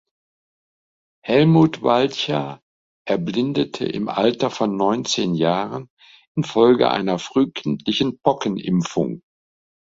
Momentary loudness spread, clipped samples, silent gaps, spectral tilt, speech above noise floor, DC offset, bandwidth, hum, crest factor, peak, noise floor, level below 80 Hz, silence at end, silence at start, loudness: 12 LU; under 0.1%; 2.62-3.05 s, 5.90-5.97 s, 6.27-6.35 s; -6 dB/octave; over 71 dB; under 0.1%; 7.8 kHz; none; 18 dB; -2 dBFS; under -90 dBFS; -58 dBFS; 0.8 s; 1.25 s; -20 LUFS